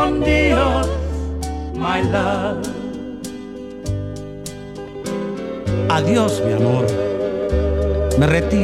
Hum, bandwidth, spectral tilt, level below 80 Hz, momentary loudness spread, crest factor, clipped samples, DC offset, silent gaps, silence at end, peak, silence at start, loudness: none; 14 kHz; -6.5 dB/octave; -28 dBFS; 15 LU; 18 dB; under 0.1%; 0.2%; none; 0 s; -2 dBFS; 0 s; -19 LUFS